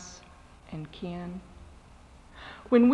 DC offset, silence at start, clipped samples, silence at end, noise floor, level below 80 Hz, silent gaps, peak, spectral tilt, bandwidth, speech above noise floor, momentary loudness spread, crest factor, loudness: under 0.1%; 0 s; under 0.1%; 0 s; -53 dBFS; -54 dBFS; none; -10 dBFS; -6.5 dB/octave; 8.2 kHz; 27 dB; 26 LU; 20 dB; -31 LUFS